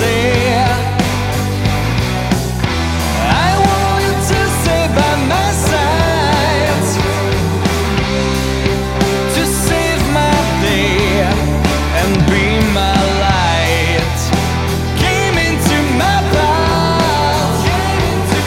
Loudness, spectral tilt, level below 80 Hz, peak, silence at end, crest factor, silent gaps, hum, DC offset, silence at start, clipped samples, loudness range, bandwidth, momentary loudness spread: -14 LUFS; -5 dB/octave; -22 dBFS; 0 dBFS; 0 s; 12 dB; none; none; under 0.1%; 0 s; under 0.1%; 2 LU; 17 kHz; 3 LU